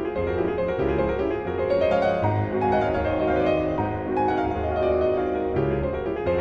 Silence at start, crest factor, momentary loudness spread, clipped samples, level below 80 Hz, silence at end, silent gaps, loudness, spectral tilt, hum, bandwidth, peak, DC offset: 0 s; 14 dB; 4 LU; under 0.1%; -38 dBFS; 0 s; none; -24 LUFS; -9 dB/octave; none; 7.2 kHz; -10 dBFS; under 0.1%